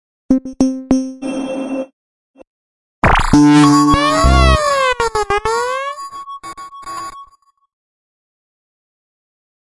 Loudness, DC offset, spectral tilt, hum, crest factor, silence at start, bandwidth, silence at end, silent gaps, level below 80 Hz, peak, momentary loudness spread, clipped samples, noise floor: -14 LUFS; under 0.1%; -5.5 dB/octave; none; 16 dB; 0.3 s; 11.5 kHz; 2.45 s; 1.93-2.34 s, 2.47-3.02 s; -24 dBFS; 0 dBFS; 20 LU; under 0.1%; -49 dBFS